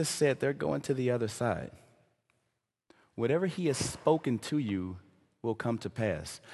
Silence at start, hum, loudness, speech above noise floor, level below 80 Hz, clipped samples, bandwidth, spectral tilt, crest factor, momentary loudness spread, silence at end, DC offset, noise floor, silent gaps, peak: 0 s; none; -32 LUFS; 51 dB; -58 dBFS; under 0.1%; 12.5 kHz; -5.5 dB/octave; 20 dB; 10 LU; 0 s; under 0.1%; -82 dBFS; none; -12 dBFS